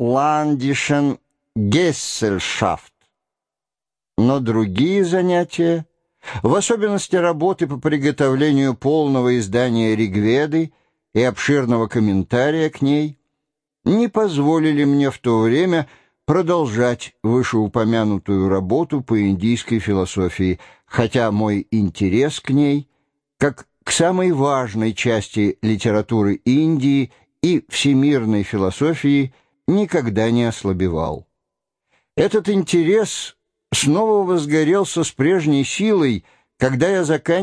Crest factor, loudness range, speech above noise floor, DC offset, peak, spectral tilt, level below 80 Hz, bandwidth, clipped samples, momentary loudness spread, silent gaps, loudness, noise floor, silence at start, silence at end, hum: 16 dB; 3 LU; over 73 dB; under 0.1%; -2 dBFS; -5.5 dB/octave; -50 dBFS; 11 kHz; under 0.1%; 6 LU; none; -18 LUFS; under -90 dBFS; 0 s; 0 s; none